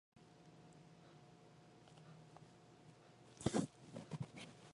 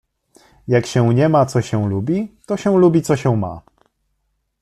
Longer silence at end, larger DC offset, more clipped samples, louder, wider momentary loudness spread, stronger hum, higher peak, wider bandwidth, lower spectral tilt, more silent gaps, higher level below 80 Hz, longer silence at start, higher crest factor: second, 0 s vs 1.05 s; neither; neither; second, -46 LUFS vs -17 LUFS; first, 23 LU vs 11 LU; neither; second, -22 dBFS vs -2 dBFS; second, 11 kHz vs 13 kHz; second, -5.5 dB/octave vs -7.5 dB/octave; neither; second, -74 dBFS vs -52 dBFS; second, 0.15 s vs 0.65 s; first, 28 dB vs 16 dB